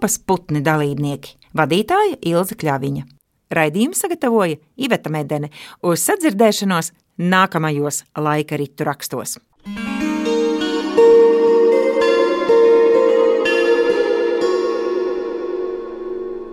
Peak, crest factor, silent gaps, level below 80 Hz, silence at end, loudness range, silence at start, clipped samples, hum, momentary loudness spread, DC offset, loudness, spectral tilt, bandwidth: 0 dBFS; 16 dB; none; -54 dBFS; 0 s; 7 LU; 0 s; under 0.1%; none; 13 LU; under 0.1%; -17 LUFS; -5 dB/octave; 16.5 kHz